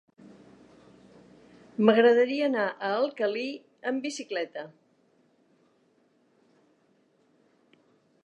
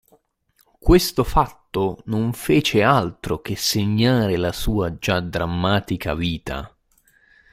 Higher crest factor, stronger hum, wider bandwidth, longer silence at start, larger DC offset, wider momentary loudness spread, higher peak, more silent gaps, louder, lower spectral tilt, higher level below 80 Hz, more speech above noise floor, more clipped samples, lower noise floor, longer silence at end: about the same, 22 dB vs 18 dB; neither; second, 9.6 kHz vs 16 kHz; first, 1.8 s vs 0.85 s; neither; first, 17 LU vs 10 LU; second, -8 dBFS vs -2 dBFS; neither; second, -26 LUFS vs -21 LUFS; about the same, -5 dB/octave vs -5.5 dB/octave; second, -82 dBFS vs -32 dBFS; about the same, 41 dB vs 44 dB; neither; about the same, -67 dBFS vs -64 dBFS; first, 3.55 s vs 0.85 s